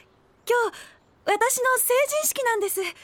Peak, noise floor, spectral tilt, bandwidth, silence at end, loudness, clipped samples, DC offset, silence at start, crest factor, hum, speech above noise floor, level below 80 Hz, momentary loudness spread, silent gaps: -8 dBFS; -43 dBFS; 0 dB/octave; 19 kHz; 0.1 s; -23 LUFS; under 0.1%; under 0.1%; 0.45 s; 16 dB; none; 19 dB; -68 dBFS; 8 LU; none